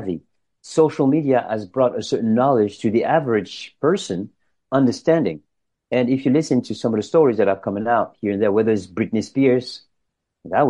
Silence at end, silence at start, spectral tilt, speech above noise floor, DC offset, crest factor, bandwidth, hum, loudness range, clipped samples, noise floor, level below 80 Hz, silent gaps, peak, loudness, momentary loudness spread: 0 s; 0 s; -6.5 dB/octave; 57 dB; under 0.1%; 16 dB; 10.5 kHz; none; 2 LU; under 0.1%; -76 dBFS; -62 dBFS; none; -4 dBFS; -20 LUFS; 9 LU